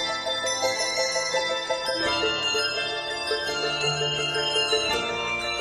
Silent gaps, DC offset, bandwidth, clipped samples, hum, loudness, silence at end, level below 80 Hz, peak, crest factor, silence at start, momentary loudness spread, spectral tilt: none; under 0.1%; 16 kHz; under 0.1%; none; -24 LUFS; 0 s; -54 dBFS; -10 dBFS; 16 dB; 0 s; 4 LU; -1.5 dB/octave